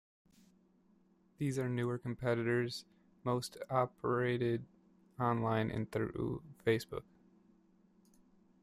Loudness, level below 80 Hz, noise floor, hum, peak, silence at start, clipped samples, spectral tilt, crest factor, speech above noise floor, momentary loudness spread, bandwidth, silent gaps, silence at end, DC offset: -37 LUFS; -66 dBFS; -70 dBFS; none; -18 dBFS; 1.4 s; under 0.1%; -6.5 dB/octave; 20 dB; 34 dB; 8 LU; 15 kHz; none; 1.6 s; under 0.1%